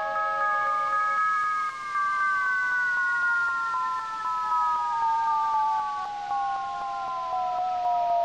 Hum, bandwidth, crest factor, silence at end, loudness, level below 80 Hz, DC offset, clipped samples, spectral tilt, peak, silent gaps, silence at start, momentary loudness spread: none; 11 kHz; 10 dB; 0 s; -26 LUFS; -66 dBFS; under 0.1%; under 0.1%; -2 dB/octave; -16 dBFS; none; 0 s; 6 LU